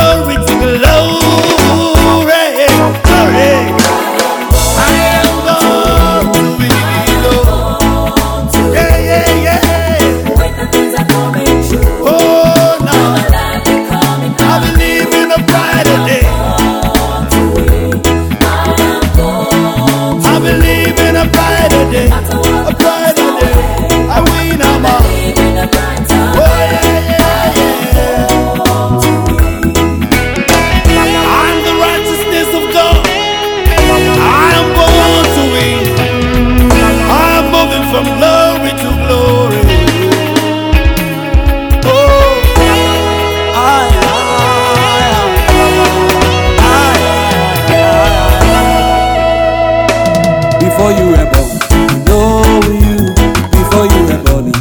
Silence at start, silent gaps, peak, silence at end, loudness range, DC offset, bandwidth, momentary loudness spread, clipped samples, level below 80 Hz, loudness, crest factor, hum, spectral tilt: 0 s; none; 0 dBFS; 0 s; 2 LU; under 0.1%; over 20 kHz; 4 LU; 1%; -16 dBFS; -9 LUFS; 8 dB; none; -5 dB/octave